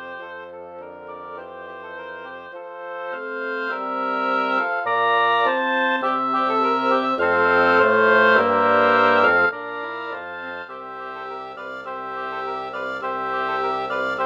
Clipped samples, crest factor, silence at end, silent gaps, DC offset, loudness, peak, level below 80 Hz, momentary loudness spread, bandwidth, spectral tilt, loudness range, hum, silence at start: under 0.1%; 18 dB; 0 s; none; under 0.1%; -20 LUFS; -4 dBFS; -64 dBFS; 20 LU; 7.4 kHz; -5.5 dB/octave; 14 LU; none; 0 s